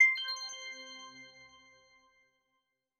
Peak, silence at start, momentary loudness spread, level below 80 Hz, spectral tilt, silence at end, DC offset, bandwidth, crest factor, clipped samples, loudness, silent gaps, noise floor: -14 dBFS; 0 s; 23 LU; -88 dBFS; 2 dB/octave; 1.55 s; under 0.1%; 13 kHz; 22 dB; under 0.1%; -34 LUFS; none; -83 dBFS